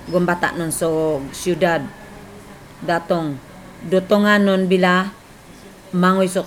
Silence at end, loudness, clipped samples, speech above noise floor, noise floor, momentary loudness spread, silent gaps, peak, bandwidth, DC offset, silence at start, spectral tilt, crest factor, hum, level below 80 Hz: 0 s; -18 LUFS; under 0.1%; 24 dB; -42 dBFS; 19 LU; none; -2 dBFS; 16.5 kHz; under 0.1%; 0 s; -5.5 dB/octave; 16 dB; none; -50 dBFS